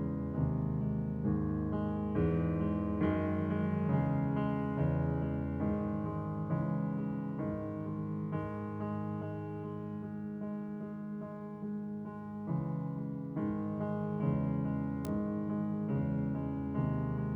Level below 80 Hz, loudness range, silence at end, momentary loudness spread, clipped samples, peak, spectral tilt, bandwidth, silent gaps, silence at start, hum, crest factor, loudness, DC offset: -52 dBFS; 7 LU; 0 s; 9 LU; under 0.1%; -20 dBFS; -10.5 dB/octave; 3.6 kHz; none; 0 s; none; 16 dB; -36 LUFS; under 0.1%